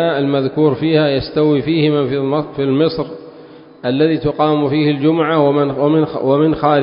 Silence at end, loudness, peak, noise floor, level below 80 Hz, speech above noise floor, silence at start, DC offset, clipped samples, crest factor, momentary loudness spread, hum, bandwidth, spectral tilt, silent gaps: 0 s; -15 LUFS; 0 dBFS; -38 dBFS; -46 dBFS; 24 dB; 0 s; under 0.1%; under 0.1%; 14 dB; 5 LU; none; 5.4 kHz; -12.5 dB/octave; none